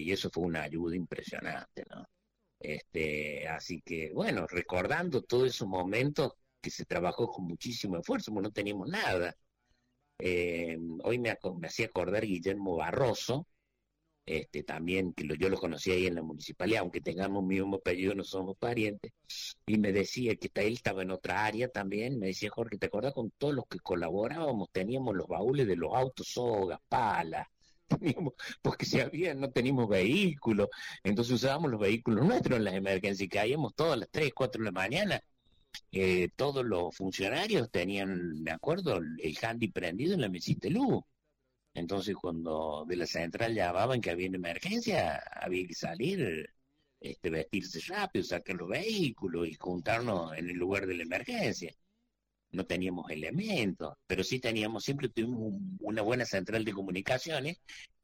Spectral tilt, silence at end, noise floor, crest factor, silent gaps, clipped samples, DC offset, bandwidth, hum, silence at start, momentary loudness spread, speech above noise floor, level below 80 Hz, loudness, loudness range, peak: -5.5 dB/octave; 0.15 s; -83 dBFS; 14 dB; none; under 0.1%; under 0.1%; 16 kHz; none; 0 s; 8 LU; 50 dB; -60 dBFS; -33 LUFS; 5 LU; -18 dBFS